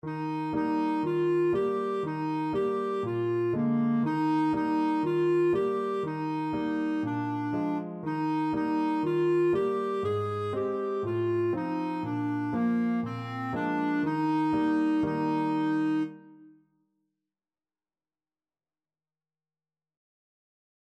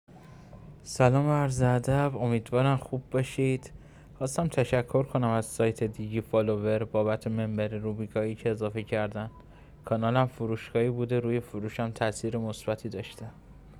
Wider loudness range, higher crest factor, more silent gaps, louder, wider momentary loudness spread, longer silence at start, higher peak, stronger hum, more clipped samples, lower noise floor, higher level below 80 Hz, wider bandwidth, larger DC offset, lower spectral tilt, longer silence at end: about the same, 3 LU vs 4 LU; second, 12 dB vs 20 dB; neither; about the same, -29 LUFS vs -29 LUFS; second, 6 LU vs 11 LU; about the same, 0.05 s vs 0.1 s; second, -18 dBFS vs -8 dBFS; neither; neither; first, under -90 dBFS vs -49 dBFS; second, -66 dBFS vs -54 dBFS; second, 8.8 kHz vs 14 kHz; neither; first, -8.5 dB/octave vs -7 dB/octave; first, 4.4 s vs 0 s